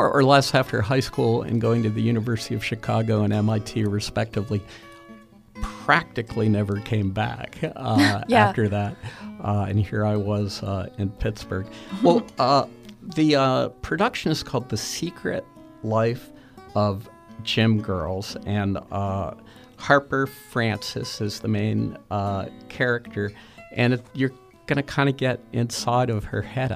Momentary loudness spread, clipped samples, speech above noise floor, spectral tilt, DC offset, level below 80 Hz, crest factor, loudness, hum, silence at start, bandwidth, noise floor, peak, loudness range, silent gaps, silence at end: 11 LU; under 0.1%; 24 dB; -6 dB/octave; under 0.1%; -48 dBFS; 22 dB; -24 LUFS; none; 0 s; 15 kHz; -47 dBFS; -2 dBFS; 4 LU; none; 0 s